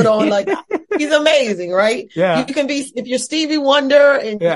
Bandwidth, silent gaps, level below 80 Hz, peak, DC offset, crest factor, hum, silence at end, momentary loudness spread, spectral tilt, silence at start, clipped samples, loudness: 11.5 kHz; none; -62 dBFS; 0 dBFS; under 0.1%; 14 dB; none; 0 s; 10 LU; -4 dB/octave; 0 s; under 0.1%; -15 LUFS